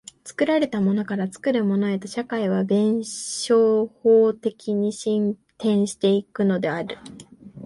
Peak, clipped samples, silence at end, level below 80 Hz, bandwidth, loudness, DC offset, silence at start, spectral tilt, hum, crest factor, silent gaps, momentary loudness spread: -8 dBFS; under 0.1%; 0 s; -66 dBFS; 11.5 kHz; -22 LUFS; under 0.1%; 0.25 s; -6 dB/octave; none; 14 dB; none; 10 LU